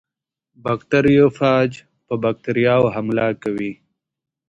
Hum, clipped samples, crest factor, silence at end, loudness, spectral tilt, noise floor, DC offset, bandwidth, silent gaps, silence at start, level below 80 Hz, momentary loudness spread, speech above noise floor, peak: none; under 0.1%; 18 dB; 0.75 s; -18 LUFS; -8 dB/octave; -80 dBFS; under 0.1%; 8 kHz; none; 0.65 s; -52 dBFS; 12 LU; 63 dB; -2 dBFS